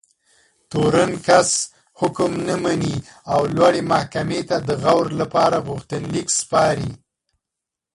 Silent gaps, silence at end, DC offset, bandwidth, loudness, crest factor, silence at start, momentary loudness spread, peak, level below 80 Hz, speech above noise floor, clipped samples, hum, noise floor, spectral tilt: none; 1 s; under 0.1%; 11.5 kHz; -19 LUFS; 20 dB; 0.7 s; 10 LU; 0 dBFS; -50 dBFS; 66 dB; under 0.1%; none; -84 dBFS; -4.5 dB/octave